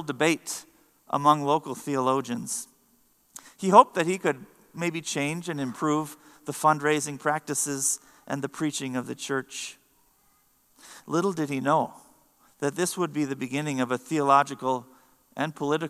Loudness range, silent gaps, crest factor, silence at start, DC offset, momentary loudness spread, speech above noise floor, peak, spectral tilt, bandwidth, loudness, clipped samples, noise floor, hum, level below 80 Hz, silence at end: 6 LU; none; 26 dB; 0 s; under 0.1%; 15 LU; 39 dB; 0 dBFS; -4 dB/octave; 15 kHz; -26 LUFS; under 0.1%; -65 dBFS; none; -76 dBFS; 0 s